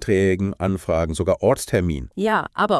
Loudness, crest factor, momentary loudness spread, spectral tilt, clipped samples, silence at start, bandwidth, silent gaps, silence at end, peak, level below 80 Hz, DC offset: -21 LUFS; 14 dB; 5 LU; -6 dB/octave; under 0.1%; 0 s; 12 kHz; none; 0 s; -6 dBFS; -40 dBFS; under 0.1%